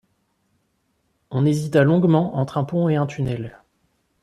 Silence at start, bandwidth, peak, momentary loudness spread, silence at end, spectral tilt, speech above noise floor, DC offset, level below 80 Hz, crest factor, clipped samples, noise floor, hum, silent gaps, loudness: 1.3 s; 12.5 kHz; -4 dBFS; 12 LU; 0.75 s; -8 dB/octave; 50 dB; under 0.1%; -56 dBFS; 18 dB; under 0.1%; -69 dBFS; none; none; -20 LUFS